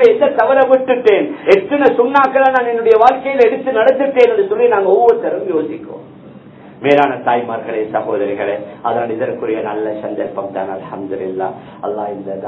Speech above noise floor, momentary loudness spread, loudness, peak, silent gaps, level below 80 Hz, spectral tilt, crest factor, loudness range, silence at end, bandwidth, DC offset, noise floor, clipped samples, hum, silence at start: 23 dB; 12 LU; -14 LUFS; 0 dBFS; none; -58 dBFS; -7 dB/octave; 14 dB; 9 LU; 0 s; 6.6 kHz; under 0.1%; -37 dBFS; 0.3%; none; 0 s